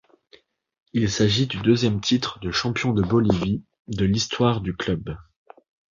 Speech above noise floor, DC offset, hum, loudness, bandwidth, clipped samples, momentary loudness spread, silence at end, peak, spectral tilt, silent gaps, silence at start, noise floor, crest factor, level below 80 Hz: 35 dB; under 0.1%; none; -23 LUFS; 7.4 kHz; under 0.1%; 9 LU; 0.7 s; -4 dBFS; -5.5 dB/octave; 3.80-3.85 s; 0.95 s; -57 dBFS; 20 dB; -44 dBFS